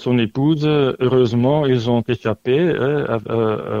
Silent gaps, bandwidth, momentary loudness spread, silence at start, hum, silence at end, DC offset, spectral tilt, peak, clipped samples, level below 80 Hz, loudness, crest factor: none; 7.4 kHz; 5 LU; 0 s; none; 0 s; under 0.1%; -8 dB/octave; -4 dBFS; under 0.1%; -50 dBFS; -18 LUFS; 14 dB